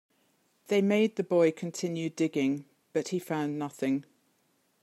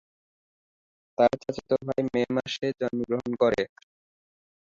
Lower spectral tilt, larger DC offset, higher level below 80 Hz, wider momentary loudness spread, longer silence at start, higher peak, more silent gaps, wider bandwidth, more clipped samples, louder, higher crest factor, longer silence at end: about the same, -6 dB/octave vs -6 dB/octave; neither; second, -82 dBFS vs -62 dBFS; about the same, 9 LU vs 7 LU; second, 0.7 s vs 1.2 s; second, -12 dBFS vs -8 dBFS; neither; first, 15 kHz vs 7.6 kHz; neither; second, -30 LUFS vs -27 LUFS; about the same, 18 dB vs 20 dB; second, 0.8 s vs 1 s